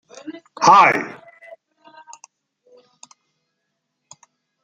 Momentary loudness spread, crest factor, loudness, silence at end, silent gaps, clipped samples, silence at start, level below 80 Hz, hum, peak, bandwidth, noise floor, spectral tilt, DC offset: 26 LU; 20 dB; -13 LUFS; 3.5 s; none; under 0.1%; 0.25 s; -74 dBFS; none; -2 dBFS; 9.2 kHz; -76 dBFS; -3 dB/octave; under 0.1%